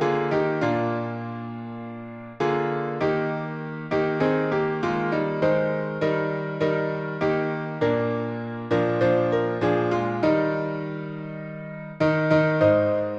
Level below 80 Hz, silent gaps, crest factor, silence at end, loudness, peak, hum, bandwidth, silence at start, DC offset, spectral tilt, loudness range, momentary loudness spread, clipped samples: -58 dBFS; none; 18 dB; 0 s; -24 LUFS; -6 dBFS; none; 7.6 kHz; 0 s; under 0.1%; -8 dB/octave; 3 LU; 13 LU; under 0.1%